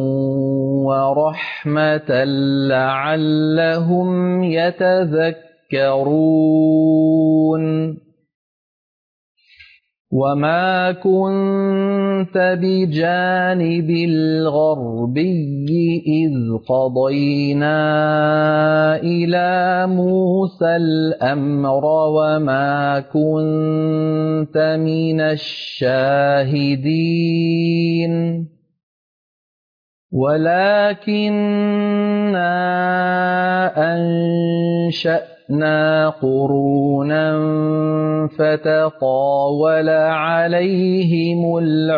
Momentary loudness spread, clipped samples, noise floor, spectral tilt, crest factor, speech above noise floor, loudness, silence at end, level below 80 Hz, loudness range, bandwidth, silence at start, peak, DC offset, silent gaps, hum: 4 LU; under 0.1%; -48 dBFS; -9 dB/octave; 10 dB; 32 dB; -17 LUFS; 0 s; -62 dBFS; 3 LU; 5.2 kHz; 0 s; -6 dBFS; under 0.1%; 8.34-9.35 s, 10.00-10.05 s, 28.83-30.09 s; none